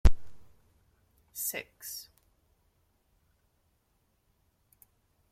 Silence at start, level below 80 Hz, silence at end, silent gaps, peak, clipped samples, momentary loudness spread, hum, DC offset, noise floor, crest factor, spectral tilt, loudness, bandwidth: 0.05 s; -38 dBFS; 3.3 s; none; -6 dBFS; under 0.1%; 18 LU; none; under 0.1%; -74 dBFS; 26 dB; -4 dB/octave; -36 LUFS; 16.5 kHz